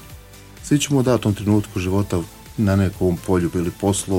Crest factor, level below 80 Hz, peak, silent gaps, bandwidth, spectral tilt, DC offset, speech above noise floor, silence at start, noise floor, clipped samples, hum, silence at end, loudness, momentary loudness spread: 16 dB; -42 dBFS; -4 dBFS; none; 17 kHz; -6 dB/octave; under 0.1%; 22 dB; 0 s; -41 dBFS; under 0.1%; none; 0 s; -20 LUFS; 6 LU